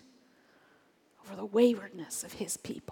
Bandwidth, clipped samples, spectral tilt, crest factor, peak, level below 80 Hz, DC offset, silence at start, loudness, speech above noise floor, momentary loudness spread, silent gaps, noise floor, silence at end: 18.5 kHz; under 0.1%; -4 dB/octave; 22 dB; -12 dBFS; -74 dBFS; under 0.1%; 1.25 s; -32 LUFS; 35 dB; 15 LU; none; -66 dBFS; 0 s